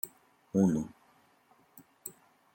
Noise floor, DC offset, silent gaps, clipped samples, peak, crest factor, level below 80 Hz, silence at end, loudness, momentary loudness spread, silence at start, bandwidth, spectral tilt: -66 dBFS; under 0.1%; none; under 0.1%; -16 dBFS; 20 dB; -68 dBFS; 0.45 s; -31 LUFS; 19 LU; 0.05 s; 17 kHz; -8 dB/octave